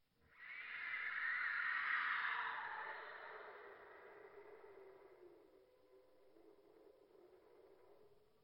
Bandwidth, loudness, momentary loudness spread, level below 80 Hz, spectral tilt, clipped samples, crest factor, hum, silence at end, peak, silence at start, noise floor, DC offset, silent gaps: 16.5 kHz; -43 LUFS; 23 LU; -90 dBFS; -3 dB/octave; under 0.1%; 20 dB; none; 0.25 s; -28 dBFS; 0.3 s; -71 dBFS; under 0.1%; none